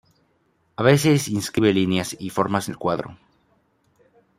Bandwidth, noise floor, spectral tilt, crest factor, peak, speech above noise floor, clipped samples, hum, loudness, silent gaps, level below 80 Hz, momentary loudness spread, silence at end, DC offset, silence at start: 16 kHz; -65 dBFS; -5.5 dB/octave; 20 dB; -2 dBFS; 45 dB; under 0.1%; none; -21 LUFS; none; -58 dBFS; 11 LU; 1.25 s; under 0.1%; 0.8 s